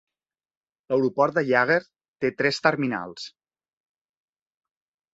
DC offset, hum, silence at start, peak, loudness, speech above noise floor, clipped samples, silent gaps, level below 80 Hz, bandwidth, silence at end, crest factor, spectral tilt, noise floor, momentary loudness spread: under 0.1%; none; 0.9 s; -2 dBFS; -23 LUFS; over 67 dB; under 0.1%; 2.08-2.14 s; -68 dBFS; 8 kHz; 1.85 s; 24 dB; -5.5 dB/octave; under -90 dBFS; 14 LU